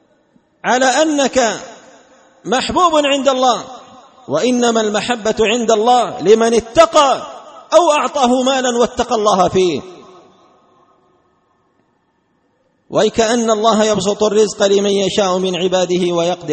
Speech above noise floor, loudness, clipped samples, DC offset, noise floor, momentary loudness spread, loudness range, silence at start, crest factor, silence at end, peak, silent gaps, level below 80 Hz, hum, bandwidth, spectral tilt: 48 dB; -14 LUFS; under 0.1%; under 0.1%; -61 dBFS; 7 LU; 7 LU; 0.65 s; 16 dB; 0 s; 0 dBFS; none; -48 dBFS; none; 8.8 kHz; -3.5 dB/octave